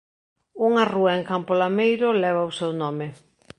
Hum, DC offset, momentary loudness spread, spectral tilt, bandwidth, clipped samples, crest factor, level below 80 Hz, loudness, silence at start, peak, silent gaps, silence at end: none; under 0.1%; 8 LU; -6.5 dB/octave; 9.8 kHz; under 0.1%; 18 dB; -68 dBFS; -22 LUFS; 0.55 s; -4 dBFS; none; 0.45 s